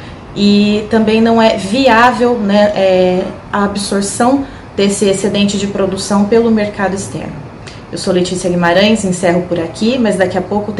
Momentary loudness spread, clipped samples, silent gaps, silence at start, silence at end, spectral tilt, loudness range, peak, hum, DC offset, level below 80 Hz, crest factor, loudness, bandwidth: 10 LU; 0.2%; none; 0 s; 0 s; -5 dB/octave; 4 LU; 0 dBFS; none; under 0.1%; -40 dBFS; 12 dB; -12 LUFS; 12 kHz